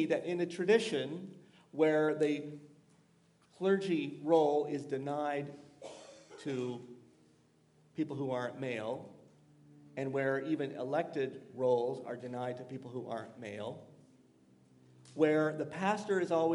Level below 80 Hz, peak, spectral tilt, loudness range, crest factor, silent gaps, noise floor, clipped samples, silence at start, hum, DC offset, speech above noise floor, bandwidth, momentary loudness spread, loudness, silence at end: -86 dBFS; -16 dBFS; -6 dB/octave; 8 LU; 20 dB; none; -68 dBFS; under 0.1%; 0 s; none; under 0.1%; 34 dB; 11.5 kHz; 19 LU; -35 LUFS; 0 s